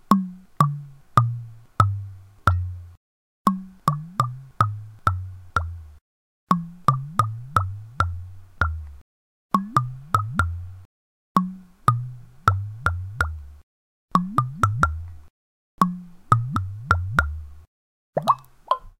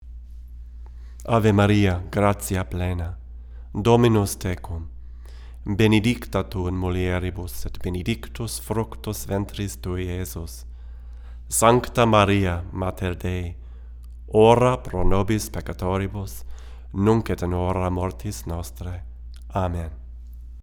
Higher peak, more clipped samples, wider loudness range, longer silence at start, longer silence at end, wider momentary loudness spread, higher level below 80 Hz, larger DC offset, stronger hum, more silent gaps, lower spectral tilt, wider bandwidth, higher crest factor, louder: about the same, 0 dBFS vs -2 dBFS; neither; second, 2 LU vs 7 LU; about the same, 0.1 s vs 0 s; about the same, 0.1 s vs 0 s; second, 15 LU vs 24 LU; about the same, -40 dBFS vs -36 dBFS; neither; neither; first, 2.97-3.45 s, 6.01-6.47 s, 9.01-9.50 s, 10.85-11.35 s, 13.63-14.08 s, 15.30-15.78 s, 17.67-18.13 s vs none; about the same, -6.5 dB/octave vs -6 dB/octave; second, 16 kHz vs over 20 kHz; about the same, 26 dB vs 22 dB; about the same, -25 LUFS vs -23 LUFS